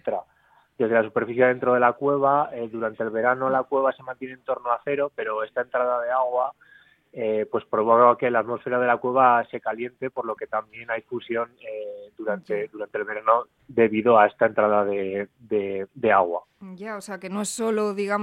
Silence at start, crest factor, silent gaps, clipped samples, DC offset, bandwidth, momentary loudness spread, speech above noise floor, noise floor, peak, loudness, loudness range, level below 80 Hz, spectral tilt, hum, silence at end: 0.05 s; 20 dB; none; under 0.1%; under 0.1%; 13 kHz; 14 LU; 37 dB; -61 dBFS; -2 dBFS; -23 LUFS; 6 LU; -68 dBFS; -5.5 dB/octave; none; 0 s